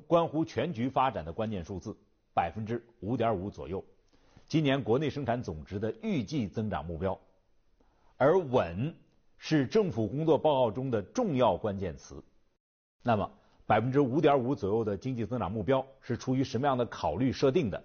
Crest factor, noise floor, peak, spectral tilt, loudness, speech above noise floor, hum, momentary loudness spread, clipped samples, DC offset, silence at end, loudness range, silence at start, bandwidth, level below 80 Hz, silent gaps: 18 dB; -66 dBFS; -14 dBFS; -6 dB/octave; -30 LUFS; 37 dB; none; 12 LU; under 0.1%; under 0.1%; 0 s; 4 LU; 0.1 s; 6.8 kHz; -56 dBFS; 12.60-12.99 s